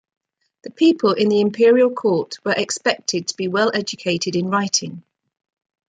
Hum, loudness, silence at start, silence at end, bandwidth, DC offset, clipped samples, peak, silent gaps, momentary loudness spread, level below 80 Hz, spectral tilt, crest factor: none; -18 LUFS; 0.65 s; 0.9 s; 9.4 kHz; under 0.1%; under 0.1%; -2 dBFS; none; 8 LU; -68 dBFS; -4 dB/octave; 16 dB